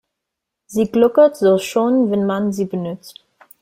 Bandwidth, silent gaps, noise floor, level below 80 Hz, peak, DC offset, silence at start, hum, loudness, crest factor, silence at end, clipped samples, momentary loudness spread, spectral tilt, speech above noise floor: 16 kHz; none; -81 dBFS; -58 dBFS; -2 dBFS; under 0.1%; 0.7 s; none; -17 LUFS; 16 dB; 0.5 s; under 0.1%; 13 LU; -6.5 dB/octave; 65 dB